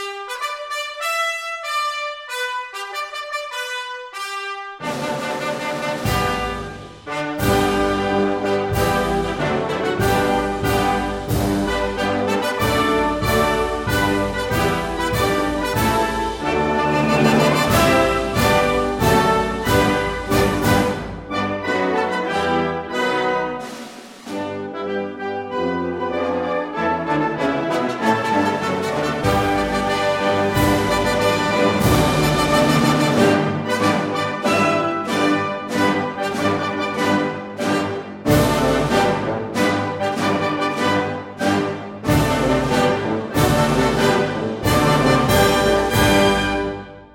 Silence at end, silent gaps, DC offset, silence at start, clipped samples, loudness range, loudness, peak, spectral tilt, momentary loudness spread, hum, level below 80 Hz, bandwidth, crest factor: 0.1 s; none; under 0.1%; 0 s; under 0.1%; 7 LU; -19 LUFS; -2 dBFS; -5 dB/octave; 10 LU; none; -36 dBFS; 17 kHz; 18 dB